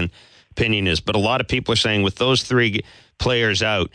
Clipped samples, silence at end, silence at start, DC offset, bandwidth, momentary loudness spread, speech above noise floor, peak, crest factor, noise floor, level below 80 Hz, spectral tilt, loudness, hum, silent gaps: under 0.1%; 0.1 s; 0 s; under 0.1%; 10.5 kHz; 7 LU; 20 dB; -6 dBFS; 16 dB; -40 dBFS; -40 dBFS; -4.5 dB/octave; -19 LUFS; none; none